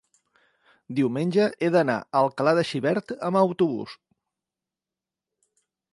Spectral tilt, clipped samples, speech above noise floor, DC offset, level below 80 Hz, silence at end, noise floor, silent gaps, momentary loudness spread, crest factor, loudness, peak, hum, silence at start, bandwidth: -7 dB/octave; under 0.1%; 66 dB; under 0.1%; -72 dBFS; 2 s; -89 dBFS; none; 6 LU; 20 dB; -24 LUFS; -6 dBFS; none; 0.9 s; 11.5 kHz